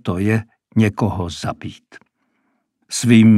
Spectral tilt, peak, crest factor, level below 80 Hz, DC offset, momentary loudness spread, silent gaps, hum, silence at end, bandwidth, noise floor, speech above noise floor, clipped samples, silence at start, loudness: -6 dB/octave; 0 dBFS; 18 dB; -48 dBFS; under 0.1%; 13 LU; none; none; 0 s; 13 kHz; -68 dBFS; 52 dB; under 0.1%; 0.05 s; -19 LUFS